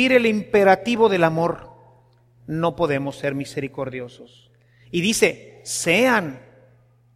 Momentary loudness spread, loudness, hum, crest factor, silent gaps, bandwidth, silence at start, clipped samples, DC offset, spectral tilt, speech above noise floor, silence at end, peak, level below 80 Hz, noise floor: 14 LU; -20 LUFS; none; 20 dB; none; 15.5 kHz; 0 s; under 0.1%; under 0.1%; -4.5 dB/octave; 36 dB; 0.75 s; -2 dBFS; -56 dBFS; -56 dBFS